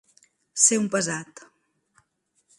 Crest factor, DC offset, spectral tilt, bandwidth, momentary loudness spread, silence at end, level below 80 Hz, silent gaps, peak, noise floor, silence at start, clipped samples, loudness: 24 dB; under 0.1%; -2.5 dB/octave; 11.5 kHz; 17 LU; 1.35 s; -74 dBFS; none; -4 dBFS; -71 dBFS; 0.55 s; under 0.1%; -21 LUFS